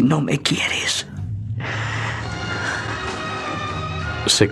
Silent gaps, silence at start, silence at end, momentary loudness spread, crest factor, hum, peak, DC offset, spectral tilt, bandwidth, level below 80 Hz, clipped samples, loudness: none; 0 s; 0 s; 8 LU; 22 dB; none; -2 dBFS; under 0.1%; -4 dB/octave; 14 kHz; -44 dBFS; under 0.1%; -22 LUFS